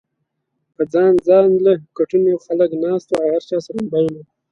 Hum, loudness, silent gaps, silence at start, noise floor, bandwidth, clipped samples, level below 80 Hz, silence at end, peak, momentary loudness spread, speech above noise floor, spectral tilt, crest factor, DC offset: none; -17 LUFS; none; 0.8 s; -74 dBFS; 7.6 kHz; under 0.1%; -60 dBFS; 0.3 s; -2 dBFS; 10 LU; 58 dB; -8 dB/octave; 16 dB; under 0.1%